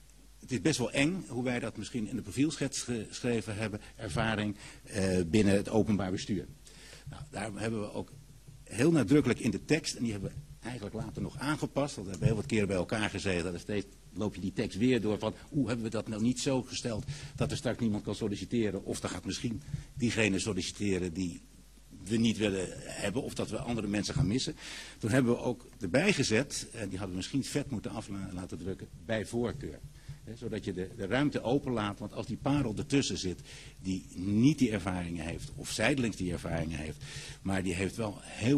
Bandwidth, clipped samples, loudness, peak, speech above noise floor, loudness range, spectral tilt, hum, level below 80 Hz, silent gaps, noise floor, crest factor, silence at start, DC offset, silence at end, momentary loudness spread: 13 kHz; under 0.1%; -33 LUFS; -12 dBFS; 22 dB; 3 LU; -5.5 dB/octave; none; -52 dBFS; none; -54 dBFS; 22 dB; 0 s; under 0.1%; 0 s; 13 LU